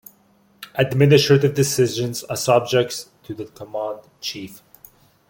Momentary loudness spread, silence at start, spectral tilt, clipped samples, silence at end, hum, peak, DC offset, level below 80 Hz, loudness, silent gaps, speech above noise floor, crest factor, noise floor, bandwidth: 19 LU; 0.6 s; -5 dB/octave; under 0.1%; 0.75 s; none; -2 dBFS; under 0.1%; -58 dBFS; -19 LUFS; none; 38 dB; 18 dB; -57 dBFS; 17 kHz